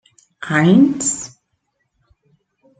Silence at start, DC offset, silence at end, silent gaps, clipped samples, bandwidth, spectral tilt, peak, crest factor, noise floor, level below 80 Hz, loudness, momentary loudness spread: 0.4 s; under 0.1%; 1.5 s; none; under 0.1%; 9.4 kHz; -5 dB/octave; -2 dBFS; 18 dB; -70 dBFS; -60 dBFS; -15 LUFS; 21 LU